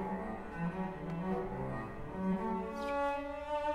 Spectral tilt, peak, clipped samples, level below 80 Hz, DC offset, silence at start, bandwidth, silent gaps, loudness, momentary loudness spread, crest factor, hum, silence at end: -8 dB/octave; -24 dBFS; under 0.1%; -54 dBFS; under 0.1%; 0 s; 11.5 kHz; none; -38 LUFS; 6 LU; 12 dB; none; 0 s